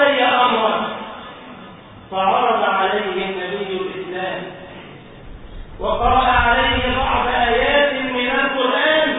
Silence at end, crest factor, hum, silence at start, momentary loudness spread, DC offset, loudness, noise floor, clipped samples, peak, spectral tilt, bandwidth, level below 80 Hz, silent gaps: 0 s; 16 dB; none; 0 s; 21 LU; under 0.1%; -17 LUFS; -39 dBFS; under 0.1%; -2 dBFS; -9.5 dB/octave; 4 kHz; -36 dBFS; none